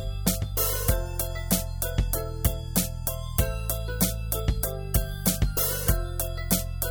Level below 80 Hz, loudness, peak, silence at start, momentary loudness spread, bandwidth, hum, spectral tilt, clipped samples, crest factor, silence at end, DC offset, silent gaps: -30 dBFS; -27 LUFS; -6 dBFS; 0 s; 5 LU; over 20 kHz; none; -4 dB/octave; under 0.1%; 20 dB; 0 s; under 0.1%; none